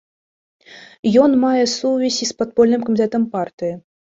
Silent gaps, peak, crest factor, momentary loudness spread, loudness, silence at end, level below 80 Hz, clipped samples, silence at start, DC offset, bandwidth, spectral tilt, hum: 0.99-1.03 s, 3.53-3.58 s; -2 dBFS; 16 dB; 11 LU; -17 LUFS; 0.35 s; -58 dBFS; under 0.1%; 0.7 s; under 0.1%; 7.8 kHz; -4.5 dB/octave; none